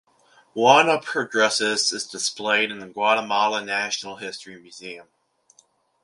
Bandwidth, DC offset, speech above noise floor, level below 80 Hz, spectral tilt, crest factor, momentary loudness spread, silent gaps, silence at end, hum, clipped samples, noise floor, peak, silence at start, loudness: 11.5 kHz; under 0.1%; 38 dB; -74 dBFS; -1.5 dB/octave; 22 dB; 21 LU; none; 1 s; none; under 0.1%; -61 dBFS; 0 dBFS; 0.55 s; -21 LUFS